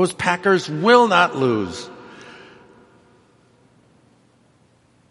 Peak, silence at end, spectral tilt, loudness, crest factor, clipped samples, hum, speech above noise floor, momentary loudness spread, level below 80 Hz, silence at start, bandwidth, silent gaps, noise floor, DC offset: 0 dBFS; 2.8 s; -5 dB/octave; -17 LUFS; 22 dB; under 0.1%; none; 40 dB; 27 LU; -62 dBFS; 0 s; 11.5 kHz; none; -57 dBFS; under 0.1%